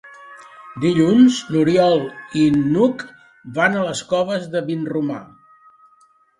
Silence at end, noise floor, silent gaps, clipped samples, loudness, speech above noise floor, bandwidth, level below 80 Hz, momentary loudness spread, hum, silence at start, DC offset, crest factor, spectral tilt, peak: 1.15 s; -56 dBFS; none; under 0.1%; -18 LUFS; 39 dB; 11 kHz; -58 dBFS; 14 LU; none; 0.05 s; under 0.1%; 16 dB; -6 dB/octave; -2 dBFS